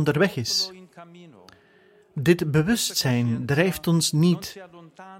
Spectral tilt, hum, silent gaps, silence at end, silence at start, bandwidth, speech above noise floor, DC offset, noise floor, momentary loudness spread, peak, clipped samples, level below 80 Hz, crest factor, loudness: -5 dB/octave; none; none; 0 s; 0 s; 16.5 kHz; 34 dB; under 0.1%; -56 dBFS; 9 LU; -6 dBFS; under 0.1%; -54 dBFS; 18 dB; -22 LUFS